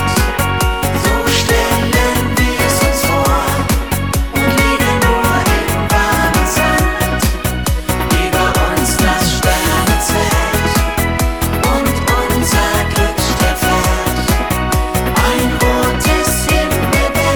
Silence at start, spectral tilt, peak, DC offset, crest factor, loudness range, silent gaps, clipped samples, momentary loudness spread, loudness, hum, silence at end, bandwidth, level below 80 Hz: 0 s; -4 dB/octave; 0 dBFS; 0.9%; 14 dB; 1 LU; none; under 0.1%; 3 LU; -13 LUFS; none; 0 s; 19.5 kHz; -20 dBFS